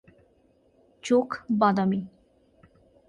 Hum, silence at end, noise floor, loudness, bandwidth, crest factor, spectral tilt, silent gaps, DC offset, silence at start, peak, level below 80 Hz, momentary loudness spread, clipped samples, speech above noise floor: none; 1 s; -63 dBFS; -25 LUFS; 10.5 kHz; 20 dB; -7 dB/octave; none; under 0.1%; 1.05 s; -8 dBFS; -66 dBFS; 15 LU; under 0.1%; 40 dB